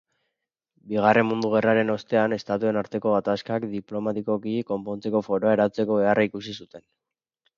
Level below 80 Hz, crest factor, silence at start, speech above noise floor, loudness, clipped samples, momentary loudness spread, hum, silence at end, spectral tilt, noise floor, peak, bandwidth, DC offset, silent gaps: -64 dBFS; 20 dB; 0.85 s; 59 dB; -24 LUFS; under 0.1%; 9 LU; none; 0.8 s; -7 dB/octave; -82 dBFS; -6 dBFS; 7.2 kHz; under 0.1%; none